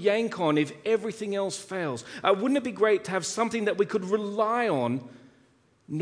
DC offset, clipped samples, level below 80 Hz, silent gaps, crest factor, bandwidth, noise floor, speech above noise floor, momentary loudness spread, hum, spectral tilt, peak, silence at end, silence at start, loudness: under 0.1%; under 0.1%; -74 dBFS; none; 18 dB; 10.5 kHz; -63 dBFS; 36 dB; 7 LU; none; -5 dB/octave; -8 dBFS; 0 s; 0 s; -27 LUFS